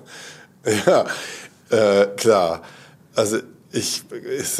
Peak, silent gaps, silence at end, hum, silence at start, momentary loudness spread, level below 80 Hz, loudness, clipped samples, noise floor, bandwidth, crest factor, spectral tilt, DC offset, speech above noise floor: -2 dBFS; none; 0 s; none; 0.1 s; 17 LU; -68 dBFS; -20 LUFS; under 0.1%; -41 dBFS; 16 kHz; 20 dB; -3.5 dB/octave; under 0.1%; 22 dB